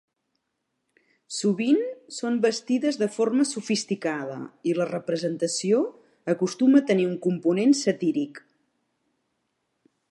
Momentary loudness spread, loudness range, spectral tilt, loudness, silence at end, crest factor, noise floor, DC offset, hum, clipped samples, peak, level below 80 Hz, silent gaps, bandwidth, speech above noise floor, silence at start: 11 LU; 3 LU; -5 dB/octave; -25 LUFS; 1.75 s; 18 dB; -79 dBFS; under 0.1%; none; under 0.1%; -8 dBFS; -78 dBFS; none; 11.5 kHz; 55 dB; 1.3 s